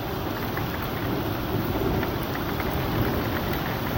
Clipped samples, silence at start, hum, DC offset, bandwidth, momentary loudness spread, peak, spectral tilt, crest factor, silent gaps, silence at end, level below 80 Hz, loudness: under 0.1%; 0 s; none; under 0.1%; 17 kHz; 3 LU; -12 dBFS; -6.5 dB/octave; 14 dB; none; 0 s; -38 dBFS; -27 LUFS